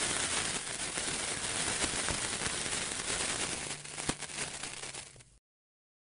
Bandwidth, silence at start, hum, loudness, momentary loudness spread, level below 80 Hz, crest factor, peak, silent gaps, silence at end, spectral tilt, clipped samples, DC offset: 11 kHz; 0 s; none; -34 LUFS; 8 LU; -56 dBFS; 26 dB; -10 dBFS; none; 0.85 s; -1 dB/octave; under 0.1%; under 0.1%